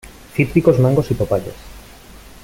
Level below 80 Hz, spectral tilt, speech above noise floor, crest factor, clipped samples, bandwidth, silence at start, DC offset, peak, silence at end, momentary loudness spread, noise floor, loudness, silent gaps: -38 dBFS; -8 dB/octave; 25 dB; 16 dB; under 0.1%; 16.5 kHz; 0.05 s; under 0.1%; -2 dBFS; 0.65 s; 16 LU; -40 dBFS; -17 LUFS; none